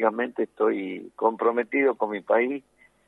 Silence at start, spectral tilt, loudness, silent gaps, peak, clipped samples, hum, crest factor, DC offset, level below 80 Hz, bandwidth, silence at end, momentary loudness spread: 0 s; -7.5 dB/octave; -25 LUFS; none; -8 dBFS; under 0.1%; none; 18 dB; under 0.1%; -76 dBFS; 4 kHz; 0.5 s; 7 LU